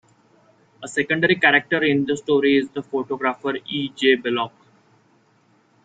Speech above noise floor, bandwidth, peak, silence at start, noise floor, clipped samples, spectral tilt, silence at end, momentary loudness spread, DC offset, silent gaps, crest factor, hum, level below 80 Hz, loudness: 39 dB; 9.2 kHz; -2 dBFS; 0.8 s; -60 dBFS; under 0.1%; -5 dB/octave; 1.35 s; 11 LU; under 0.1%; none; 20 dB; none; -64 dBFS; -20 LUFS